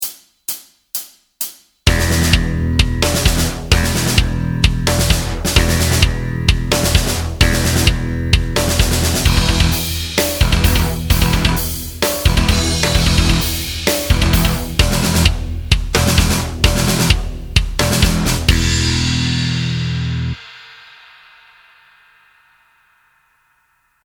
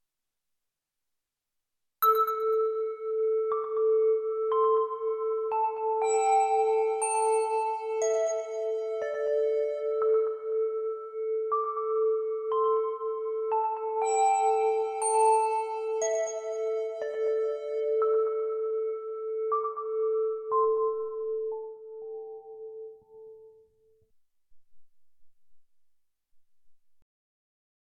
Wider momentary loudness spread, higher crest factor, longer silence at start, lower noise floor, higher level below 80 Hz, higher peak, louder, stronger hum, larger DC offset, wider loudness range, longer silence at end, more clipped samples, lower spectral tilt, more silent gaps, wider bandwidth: about the same, 8 LU vs 9 LU; about the same, 16 dB vs 16 dB; second, 0 s vs 2 s; second, -61 dBFS vs -86 dBFS; first, -20 dBFS vs -82 dBFS; first, 0 dBFS vs -14 dBFS; first, -16 LUFS vs -28 LUFS; neither; neither; about the same, 3 LU vs 5 LU; first, 3.3 s vs 1.25 s; neither; first, -4 dB/octave vs -0.5 dB/octave; neither; first, over 20 kHz vs 13 kHz